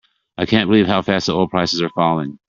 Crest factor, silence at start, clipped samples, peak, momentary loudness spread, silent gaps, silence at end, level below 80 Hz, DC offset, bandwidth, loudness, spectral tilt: 18 dB; 0.4 s; under 0.1%; 0 dBFS; 5 LU; none; 0.1 s; -52 dBFS; under 0.1%; 7.6 kHz; -17 LUFS; -5.5 dB/octave